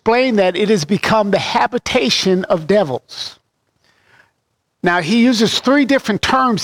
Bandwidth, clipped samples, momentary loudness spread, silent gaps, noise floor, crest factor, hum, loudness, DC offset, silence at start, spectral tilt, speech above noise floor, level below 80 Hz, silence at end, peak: 16.5 kHz; under 0.1%; 8 LU; none; -69 dBFS; 14 dB; none; -15 LUFS; under 0.1%; 0.05 s; -4.5 dB/octave; 54 dB; -48 dBFS; 0 s; -2 dBFS